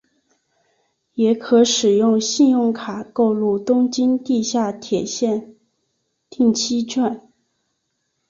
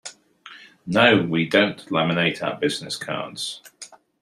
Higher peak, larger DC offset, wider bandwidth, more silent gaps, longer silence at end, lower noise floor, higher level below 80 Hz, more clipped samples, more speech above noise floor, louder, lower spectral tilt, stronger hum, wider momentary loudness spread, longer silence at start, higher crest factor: about the same, -4 dBFS vs -2 dBFS; neither; second, 7.6 kHz vs 14.5 kHz; neither; first, 1.1 s vs 0.25 s; first, -72 dBFS vs -46 dBFS; about the same, -62 dBFS vs -62 dBFS; neither; first, 55 dB vs 25 dB; first, -18 LUFS vs -21 LUFS; about the same, -4 dB/octave vs -4.5 dB/octave; neither; second, 8 LU vs 23 LU; first, 1.15 s vs 0.05 s; second, 16 dB vs 22 dB